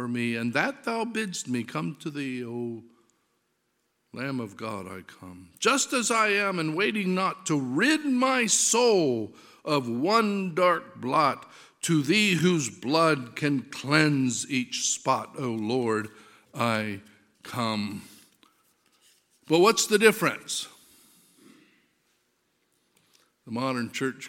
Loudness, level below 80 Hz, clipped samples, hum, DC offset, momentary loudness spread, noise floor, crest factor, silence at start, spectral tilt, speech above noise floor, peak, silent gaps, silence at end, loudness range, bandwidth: -26 LUFS; -76 dBFS; under 0.1%; none; under 0.1%; 15 LU; -75 dBFS; 24 dB; 0 s; -3.5 dB/octave; 49 dB; -4 dBFS; none; 0 s; 12 LU; 17 kHz